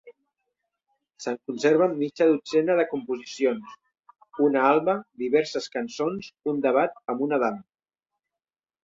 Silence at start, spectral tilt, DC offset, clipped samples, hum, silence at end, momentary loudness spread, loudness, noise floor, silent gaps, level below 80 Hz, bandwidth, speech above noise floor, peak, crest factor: 0.05 s; -5.5 dB/octave; under 0.1%; under 0.1%; none; 1.2 s; 11 LU; -25 LUFS; under -90 dBFS; none; -72 dBFS; 7.8 kHz; over 66 dB; -8 dBFS; 18 dB